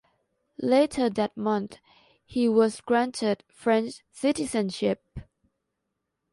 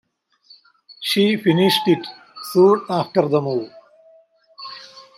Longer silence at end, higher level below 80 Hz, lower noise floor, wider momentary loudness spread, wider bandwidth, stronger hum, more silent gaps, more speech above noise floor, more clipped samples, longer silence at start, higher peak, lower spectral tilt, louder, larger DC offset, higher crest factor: first, 1.1 s vs 0.15 s; first, -58 dBFS vs -68 dBFS; first, -81 dBFS vs -54 dBFS; second, 12 LU vs 20 LU; second, 11.5 kHz vs 15.5 kHz; neither; neither; first, 56 dB vs 37 dB; neither; second, 0.6 s vs 1 s; second, -10 dBFS vs -4 dBFS; about the same, -5 dB/octave vs -5.5 dB/octave; second, -26 LUFS vs -18 LUFS; neither; about the same, 18 dB vs 18 dB